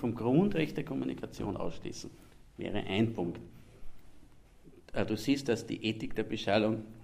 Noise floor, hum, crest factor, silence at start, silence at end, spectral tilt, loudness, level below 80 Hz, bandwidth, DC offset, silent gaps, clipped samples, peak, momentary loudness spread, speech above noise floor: -56 dBFS; none; 20 dB; 0 s; 0 s; -6 dB/octave; -33 LUFS; -54 dBFS; 15.5 kHz; under 0.1%; none; under 0.1%; -14 dBFS; 14 LU; 23 dB